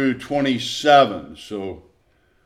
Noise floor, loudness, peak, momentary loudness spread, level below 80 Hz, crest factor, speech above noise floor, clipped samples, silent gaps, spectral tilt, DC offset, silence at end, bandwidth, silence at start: -61 dBFS; -18 LUFS; -2 dBFS; 18 LU; -56 dBFS; 18 dB; 41 dB; under 0.1%; none; -4.5 dB/octave; under 0.1%; 0.65 s; 14 kHz; 0 s